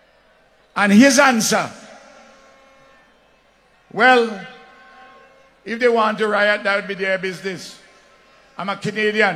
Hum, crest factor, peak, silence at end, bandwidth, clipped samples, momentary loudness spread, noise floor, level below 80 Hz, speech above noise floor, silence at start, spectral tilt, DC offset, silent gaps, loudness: none; 20 dB; 0 dBFS; 0 s; 15.5 kHz; under 0.1%; 20 LU; -56 dBFS; -66 dBFS; 39 dB; 0.75 s; -3.5 dB/octave; under 0.1%; none; -17 LUFS